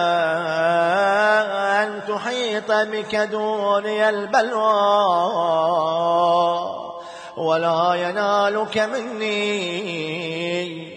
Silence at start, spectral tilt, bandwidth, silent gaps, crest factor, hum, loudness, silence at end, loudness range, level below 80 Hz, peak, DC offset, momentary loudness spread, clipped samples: 0 s; -4.5 dB/octave; 10 kHz; none; 14 dB; none; -20 LUFS; 0 s; 3 LU; -70 dBFS; -6 dBFS; under 0.1%; 8 LU; under 0.1%